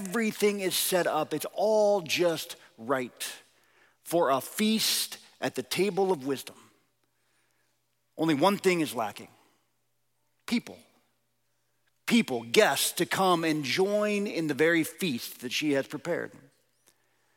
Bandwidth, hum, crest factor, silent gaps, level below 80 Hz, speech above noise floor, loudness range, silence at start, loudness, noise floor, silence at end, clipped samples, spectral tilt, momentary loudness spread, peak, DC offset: 17 kHz; none; 22 dB; none; -78 dBFS; 50 dB; 6 LU; 0 s; -28 LUFS; -78 dBFS; 1.1 s; under 0.1%; -3.5 dB/octave; 12 LU; -8 dBFS; under 0.1%